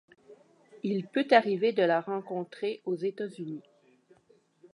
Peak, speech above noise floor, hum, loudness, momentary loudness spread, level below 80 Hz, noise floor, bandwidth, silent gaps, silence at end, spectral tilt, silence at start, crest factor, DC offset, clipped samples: -8 dBFS; 36 dB; none; -29 LUFS; 14 LU; -86 dBFS; -65 dBFS; 11 kHz; none; 1.15 s; -7 dB/octave; 0.3 s; 22 dB; under 0.1%; under 0.1%